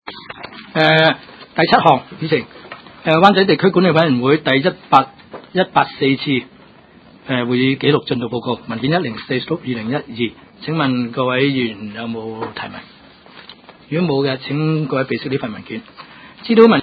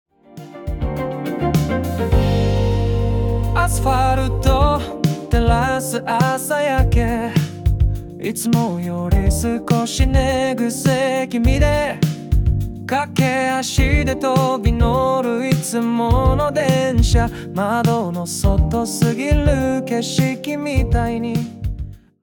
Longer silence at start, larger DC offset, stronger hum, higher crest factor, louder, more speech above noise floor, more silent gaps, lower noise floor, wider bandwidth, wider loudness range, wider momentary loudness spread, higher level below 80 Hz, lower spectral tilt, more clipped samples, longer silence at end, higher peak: second, 0.05 s vs 0.35 s; neither; neither; about the same, 18 dB vs 14 dB; about the same, -17 LUFS vs -18 LUFS; first, 29 dB vs 21 dB; neither; first, -45 dBFS vs -38 dBFS; second, 8 kHz vs 18 kHz; first, 7 LU vs 2 LU; first, 17 LU vs 7 LU; second, -56 dBFS vs -24 dBFS; first, -8 dB/octave vs -6 dB/octave; neither; second, 0 s vs 0.25 s; first, 0 dBFS vs -4 dBFS